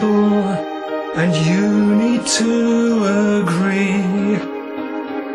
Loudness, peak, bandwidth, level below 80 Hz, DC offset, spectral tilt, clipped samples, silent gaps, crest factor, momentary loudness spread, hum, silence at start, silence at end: -17 LUFS; -4 dBFS; 11.5 kHz; -54 dBFS; under 0.1%; -5.5 dB/octave; under 0.1%; none; 12 dB; 10 LU; none; 0 s; 0 s